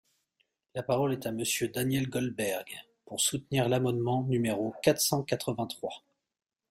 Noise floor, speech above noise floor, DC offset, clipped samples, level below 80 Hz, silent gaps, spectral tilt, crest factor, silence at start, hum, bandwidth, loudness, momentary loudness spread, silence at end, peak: -77 dBFS; 47 dB; under 0.1%; under 0.1%; -64 dBFS; none; -4.5 dB/octave; 22 dB; 0.75 s; none; 16 kHz; -30 LUFS; 12 LU; 0.75 s; -10 dBFS